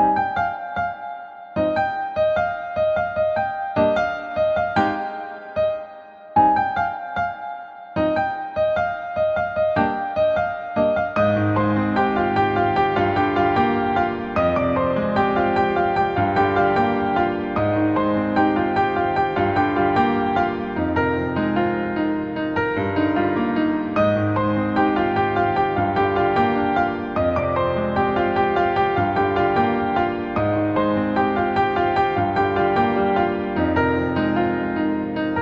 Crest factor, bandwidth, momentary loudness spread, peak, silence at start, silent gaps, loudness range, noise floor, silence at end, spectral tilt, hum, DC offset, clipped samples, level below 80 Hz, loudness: 14 dB; 7 kHz; 5 LU; -6 dBFS; 0 s; none; 3 LU; -40 dBFS; 0 s; -8.5 dB/octave; none; under 0.1%; under 0.1%; -46 dBFS; -21 LUFS